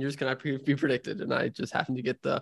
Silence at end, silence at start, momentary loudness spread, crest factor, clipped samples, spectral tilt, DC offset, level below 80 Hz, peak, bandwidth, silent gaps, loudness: 0 s; 0 s; 3 LU; 22 dB; under 0.1%; -6.5 dB/octave; under 0.1%; -68 dBFS; -8 dBFS; 12 kHz; none; -30 LUFS